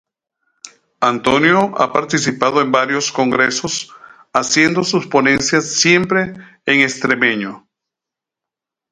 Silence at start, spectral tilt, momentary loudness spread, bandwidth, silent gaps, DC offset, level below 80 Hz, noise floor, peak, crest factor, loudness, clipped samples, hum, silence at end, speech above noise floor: 0.65 s; -3.5 dB/octave; 9 LU; 11.5 kHz; none; under 0.1%; -54 dBFS; -85 dBFS; 0 dBFS; 16 dB; -15 LUFS; under 0.1%; none; 1.35 s; 70 dB